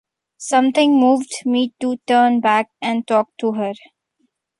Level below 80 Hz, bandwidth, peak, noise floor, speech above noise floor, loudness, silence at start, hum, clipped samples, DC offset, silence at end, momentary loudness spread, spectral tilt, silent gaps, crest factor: -70 dBFS; 11.5 kHz; -2 dBFS; -68 dBFS; 51 dB; -17 LUFS; 0.4 s; none; under 0.1%; under 0.1%; 0.85 s; 10 LU; -4 dB/octave; none; 16 dB